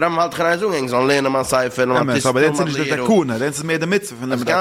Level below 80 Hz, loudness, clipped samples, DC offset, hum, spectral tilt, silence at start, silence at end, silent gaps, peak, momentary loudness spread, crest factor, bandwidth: -54 dBFS; -18 LUFS; under 0.1%; under 0.1%; none; -4.5 dB/octave; 0 s; 0 s; none; -4 dBFS; 5 LU; 14 dB; 16.5 kHz